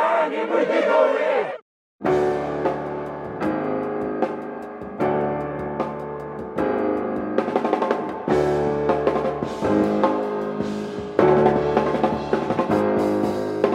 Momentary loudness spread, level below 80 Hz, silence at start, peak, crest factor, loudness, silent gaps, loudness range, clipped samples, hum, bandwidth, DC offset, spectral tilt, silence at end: 10 LU; -50 dBFS; 0 s; -2 dBFS; 20 dB; -22 LUFS; 1.62-1.99 s; 5 LU; under 0.1%; none; 11.5 kHz; under 0.1%; -7.5 dB/octave; 0 s